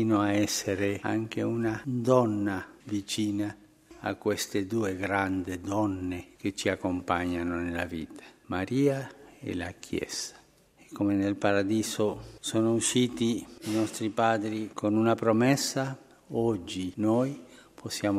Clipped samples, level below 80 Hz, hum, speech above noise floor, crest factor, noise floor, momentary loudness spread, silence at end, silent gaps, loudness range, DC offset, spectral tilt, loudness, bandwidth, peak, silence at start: under 0.1%; -60 dBFS; none; 31 dB; 20 dB; -59 dBFS; 11 LU; 0 s; none; 4 LU; under 0.1%; -5 dB/octave; -29 LUFS; 16 kHz; -8 dBFS; 0 s